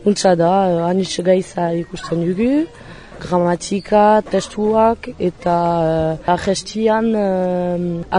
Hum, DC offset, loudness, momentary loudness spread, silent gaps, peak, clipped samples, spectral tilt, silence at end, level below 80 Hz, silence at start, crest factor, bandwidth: none; under 0.1%; -17 LUFS; 8 LU; none; -2 dBFS; under 0.1%; -6 dB/octave; 0 s; -44 dBFS; 0 s; 14 dB; 10.5 kHz